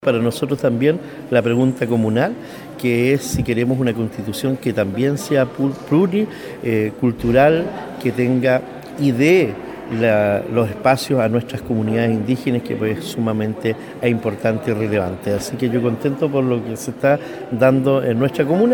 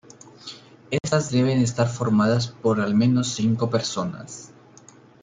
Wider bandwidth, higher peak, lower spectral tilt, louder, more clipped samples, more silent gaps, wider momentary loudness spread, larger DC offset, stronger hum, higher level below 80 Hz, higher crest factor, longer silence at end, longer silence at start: first, 19 kHz vs 9.4 kHz; first, -2 dBFS vs -8 dBFS; about the same, -6.5 dB/octave vs -6 dB/octave; first, -19 LUFS vs -22 LUFS; neither; neither; second, 7 LU vs 19 LU; neither; neither; first, -48 dBFS vs -60 dBFS; about the same, 16 dB vs 16 dB; second, 0 s vs 0.75 s; second, 0 s vs 0.45 s